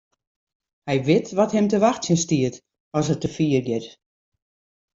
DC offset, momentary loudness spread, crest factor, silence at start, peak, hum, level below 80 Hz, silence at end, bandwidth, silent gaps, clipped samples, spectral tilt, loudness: under 0.1%; 9 LU; 18 dB; 0.85 s; -6 dBFS; none; -58 dBFS; 1.1 s; 7.8 kHz; 2.80-2.91 s; under 0.1%; -5.5 dB/octave; -22 LUFS